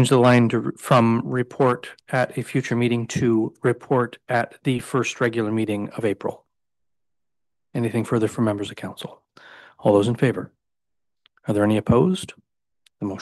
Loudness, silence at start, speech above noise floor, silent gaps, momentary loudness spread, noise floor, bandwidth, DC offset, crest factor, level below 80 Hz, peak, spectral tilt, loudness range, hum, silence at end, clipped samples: -22 LUFS; 0 s; 66 dB; none; 14 LU; -87 dBFS; 12.5 kHz; under 0.1%; 18 dB; -58 dBFS; -4 dBFS; -6.5 dB/octave; 5 LU; none; 0 s; under 0.1%